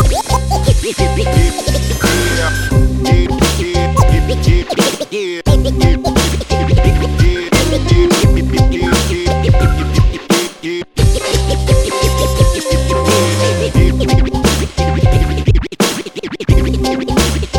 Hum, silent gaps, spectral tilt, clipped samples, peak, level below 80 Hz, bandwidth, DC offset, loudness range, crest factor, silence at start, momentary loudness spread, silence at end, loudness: none; none; -5 dB/octave; under 0.1%; 0 dBFS; -16 dBFS; 18.5 kHz; under 0.1%; 2 LU; 12 dB; 0 s; 4 LU; 0 s; -13 LUFS